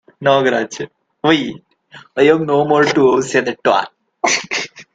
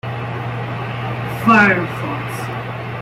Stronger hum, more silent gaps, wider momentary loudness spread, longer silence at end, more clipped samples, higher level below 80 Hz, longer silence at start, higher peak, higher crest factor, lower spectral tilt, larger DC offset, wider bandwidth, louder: neither; neither; about the same, 14 LU vs 14 LU; about the same, 0.1 s vs 0 s; neither; second, -60 dBFS vs -48 dBFS; first, 0.2 s vs 0.05 s; about the same, 0 dBFS vs -2 dBFS; about the same, 16 dB vs 18 dB; second, -4 dB/octave vs -6.5 dB/octave; neither; second, 9.2 kHz vs 16 kHz; first, -15 LUFS vs -18 LUFS